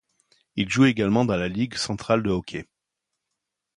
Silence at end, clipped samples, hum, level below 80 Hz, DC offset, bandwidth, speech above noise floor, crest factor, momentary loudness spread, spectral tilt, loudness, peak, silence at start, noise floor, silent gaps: 1.15 s; under 0.1%; none; -50 dBFS; under 0.1%; 11 kHz; 60 dB; 20 dB; 14 LU; -5.5 dB/octave; -23 LUFS; -6 dBFS; 0.55 s; -83 dBFS; none